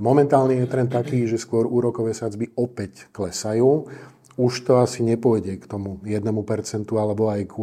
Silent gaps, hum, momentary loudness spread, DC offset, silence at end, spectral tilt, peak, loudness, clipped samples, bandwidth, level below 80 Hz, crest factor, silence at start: none; none; 12 LU; under 0.1%; 0 s; -7 dB/octave; -2 dBFS; -22 LUFS; under 0.1%; 14.5 kHz; -62 dBFS; 18 dB; 0 s